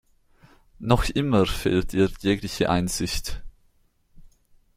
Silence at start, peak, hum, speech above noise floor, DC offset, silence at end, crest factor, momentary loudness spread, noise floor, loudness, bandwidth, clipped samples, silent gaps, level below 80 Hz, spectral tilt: 0.8 s; -2 dBFS; none; 40 dB; under 0.1%; 0.55 s; 22 dB; 10 LU; -63 dBFS; -24 LUFS; 16 kHz; under 0.1%; none; -36 dBFS; -5.5 dB/octave